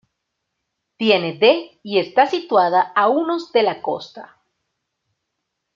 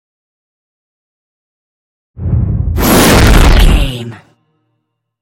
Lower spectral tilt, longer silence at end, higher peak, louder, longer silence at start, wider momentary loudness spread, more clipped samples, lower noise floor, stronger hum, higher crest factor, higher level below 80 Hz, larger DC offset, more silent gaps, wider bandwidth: about the same, -5.5 dB/octave vs -5 dB/octave; first, 1.5 s vs 1.05 s; about the same, -2 dBFS vs 0 dBFS; second, -18 LUFS vs -9 LUFS; second, 1 s vs 2.2 s; second, 9 LU vs 17 LU; second, under 0.1% vs 0.4%; first, -77 dBFS vs -68 dBFS; neither; first, 18 dB vs 12 dB; second, -72 dBFS vs -14 dBFS; neither; neither; second, 7.4 kHz vs 17.5 kHz